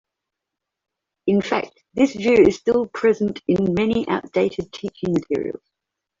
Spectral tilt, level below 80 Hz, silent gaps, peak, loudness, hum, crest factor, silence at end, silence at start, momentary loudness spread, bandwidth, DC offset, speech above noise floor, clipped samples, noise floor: -6.5 dB/octave; -52 dBFS; none; -2 dBFS; -20 LUFS; none; 18 dB; 0.65 s; 1.25 s; 13 LU; 7.6 kHz; under 0.1%; 64 dB; under 0.1%; -83 dBFS